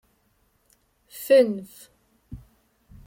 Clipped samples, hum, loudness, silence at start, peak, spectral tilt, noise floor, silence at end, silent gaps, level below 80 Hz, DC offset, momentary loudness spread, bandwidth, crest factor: under 0.1%; none; -21 LUFS; 1.15 s; -8 dBFS; -5 dB/octave; -67 dBFS; 0.7 s; none; -56 dBFS; under 0.1%; 27 LU; 16.5 kHz; 20 dB